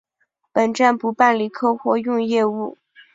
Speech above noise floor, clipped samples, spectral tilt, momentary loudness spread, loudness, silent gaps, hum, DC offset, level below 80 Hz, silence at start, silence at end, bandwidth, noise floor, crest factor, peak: 51 dB; under 0.1%; -5 dB/octave; 7 LU; -19 LUFS; none; none; under 0.1%; -68 dBFS; 0.55 s; 0.45 s; 7.8 kHz; -70 dBFS; 18 dB; -2 dBFS